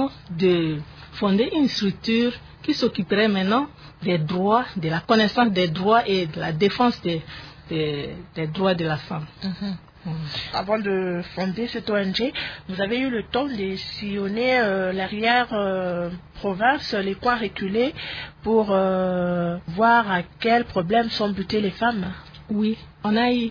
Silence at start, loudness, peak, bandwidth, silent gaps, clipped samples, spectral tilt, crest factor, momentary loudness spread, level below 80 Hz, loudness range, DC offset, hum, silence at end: 0 s; -23 LUFS; -4 dBFS; 5.4 kHz; none; under 0.1%; -6.5 dB/octave; 18 dB; 11 LU; -50 dBFS; 5 LU; under 0.1%; none; 0 s